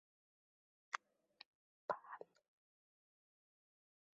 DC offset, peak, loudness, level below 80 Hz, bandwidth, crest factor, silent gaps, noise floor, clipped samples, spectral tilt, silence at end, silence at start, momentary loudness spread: under 0.1%; -22 dBFS; -50 LUFS; under -90 dBFS; 5.2 kHz; 34 dB; 1.46-1.88 s; -68 dBFS; under 0.1%; 0 dB/octave; 1.9 s; 0.95 s; 17 LU